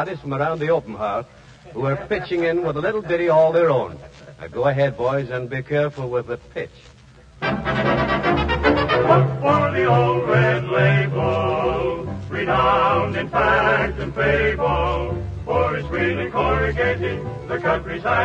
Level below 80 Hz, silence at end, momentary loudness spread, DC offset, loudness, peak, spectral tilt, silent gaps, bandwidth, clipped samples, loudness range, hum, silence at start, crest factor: -36 dBFS; 0 s; 11 LU; under 0.1%; -20 LUFS; -2 dBFS; -7.5 dB/octave; none; 8 kHz; under 0.1%; 6 LU; none; 0 s; 18 dB